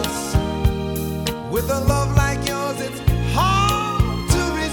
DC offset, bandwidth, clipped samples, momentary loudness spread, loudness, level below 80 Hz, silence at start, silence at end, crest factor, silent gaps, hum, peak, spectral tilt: under 0.1%; 19 kHz; under 0.1%; 6 LU; -20 LUFS; -26 dBFS; 0 s; 0 s; 18 dB; none; none; -2 dBFS; -5 dB/octave